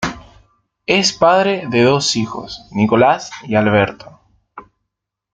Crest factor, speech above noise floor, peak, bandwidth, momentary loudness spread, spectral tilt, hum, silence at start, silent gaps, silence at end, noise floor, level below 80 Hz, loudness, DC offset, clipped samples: 16 dB; 64 dB; 0 dBFS; 9.4 kHz; 13 LU; -4.5 dB/octave; none; 0 s; none; 0.75 s; -79 dBFS; -50 dBFS; -15 LUFS; under 0.1%; under 0.1%